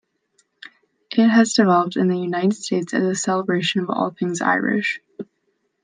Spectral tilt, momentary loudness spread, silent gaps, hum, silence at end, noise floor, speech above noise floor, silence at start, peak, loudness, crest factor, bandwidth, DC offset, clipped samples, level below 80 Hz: -5 dB/octave; 10 LU; none; none; 0.6 s; -70 dBFS; 51 dB; 1.1 s; -4 dBFS; -20 LUFS; 18 dB; 9.8 kHz; under 0.1%; under 0.1%; -70 dBFS